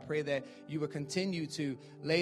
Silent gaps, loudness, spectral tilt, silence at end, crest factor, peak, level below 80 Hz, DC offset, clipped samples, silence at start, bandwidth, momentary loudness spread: none; -37 LUFS; -5 dB/octave; 0 s; 20 dB; -16 dBFS; -74 dBFS; under 0.1%; under 0.1%; 0 s; 13.5 kHz; 6 LU